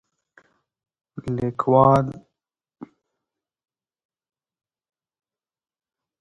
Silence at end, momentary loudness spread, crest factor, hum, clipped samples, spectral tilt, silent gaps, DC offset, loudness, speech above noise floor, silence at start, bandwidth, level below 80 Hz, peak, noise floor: 3.35 s; 19 LU; 24 dB; none; under 0.1%; -9.5 dB/octave; none; under 0.1%; -20 LUFS; 66 dB; 1.15 s; 10.5 kHz; -56 dBFS; -2 dBFS; -85 dBFS